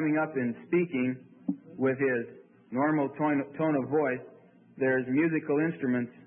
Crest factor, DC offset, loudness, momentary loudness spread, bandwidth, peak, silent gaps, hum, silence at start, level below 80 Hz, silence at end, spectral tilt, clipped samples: 14 dB; under 0.1%; -29 LUFS; 10 LU; 3.5 kHz; -16 dBFS; none; none; 0 s; -76 dBFS; 0.05 s; -11.5 dB/octave; under 0.1%